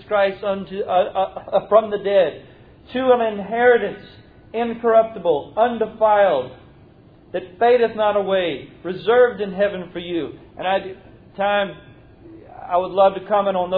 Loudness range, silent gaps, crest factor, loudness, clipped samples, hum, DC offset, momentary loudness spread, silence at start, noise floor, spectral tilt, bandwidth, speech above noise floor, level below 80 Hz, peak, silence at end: 4 LU; none; 18 dB; -19 LUFS; under 0.1%; none; under 0.1%; 14 LU; 0 s; -48 dBFS; -9 dB/octave; 4.8 kHz; 29 dB; -54 dBFS; -2 dBFS; 0 s